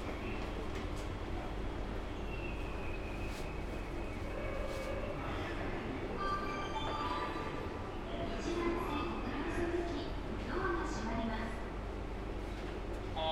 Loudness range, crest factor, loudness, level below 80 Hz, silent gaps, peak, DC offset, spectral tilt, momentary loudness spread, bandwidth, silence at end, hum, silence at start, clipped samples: 4 LU; 14 dB; -40 LUFS; -44 dBFS; none; -24 dBFS; under 0.1%; -6 dB/octave; 6 LU; 13.5 kHz; 0 s; none; 0 s; under 0.1%